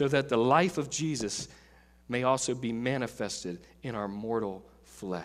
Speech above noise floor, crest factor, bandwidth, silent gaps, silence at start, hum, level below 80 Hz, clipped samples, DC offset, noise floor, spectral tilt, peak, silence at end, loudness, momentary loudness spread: 25 dB; 22 dB; 15.5 kHz; none; 0 s; none; -60 dBFS; under 0.1%; under 0.1%; -56 dBFS; -4.5 dB/octave; -10 dBFS; 0 s; -31 LUFS; 15 LU